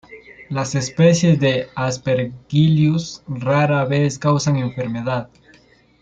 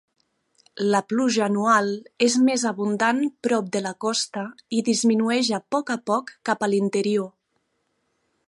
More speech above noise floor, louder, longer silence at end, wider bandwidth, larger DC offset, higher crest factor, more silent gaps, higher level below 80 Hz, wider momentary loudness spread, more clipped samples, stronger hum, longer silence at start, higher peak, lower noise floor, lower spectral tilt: second, 35 dB vs 50 dB; first, -18 LUFS vs -23 LUFS; second, 0.75 s vs 1.2 s; second, 7.8 kHz vs 11.5 kHz; neither; about the same, 16 dB vs 18 dB; neither; first, -52 dBFS vs -74 dBFS; about the same, 10 LU vs 8 LU; neither; neither; second, 0.1 s vs 0.75 s; first, -2 dBFS vs -6 dBFS; second, -52 dBFS vs -73 dBFS; first, -6 dB/octave vs -4 dB/octave